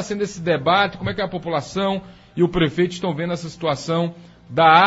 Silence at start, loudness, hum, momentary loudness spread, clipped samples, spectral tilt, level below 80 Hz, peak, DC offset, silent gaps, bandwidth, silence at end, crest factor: 0 s; -21 LUFS; none; 9 LU; under 0.1%; -5.5 dB/octave; -46 dBFS; 0 dBFS; under 0.1%; none; 8 kHz; 0 s; 20 dB